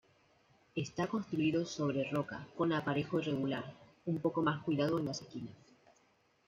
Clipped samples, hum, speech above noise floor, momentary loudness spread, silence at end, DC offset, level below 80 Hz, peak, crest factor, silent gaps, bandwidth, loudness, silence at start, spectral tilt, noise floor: under 0.1%; none; 36 dB; 11 LU; 0.9 s; under 0.1%; -72 dBFS; -20 dBFS; 18 dB; none; 7.6 kHz; -36 LUFS; 0.75 s; -6.5 dB/octave; -72 dBFS